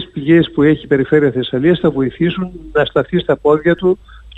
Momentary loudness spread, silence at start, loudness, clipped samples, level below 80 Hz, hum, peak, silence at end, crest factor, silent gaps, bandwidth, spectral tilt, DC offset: 5 LU; 0 s; -14 LUFS; under 0.1%; -40 dBFS; none; 0 dBFS; 0 s; 14 dB; none; 4.1 kHz; -9 dB/octave; under 0.1%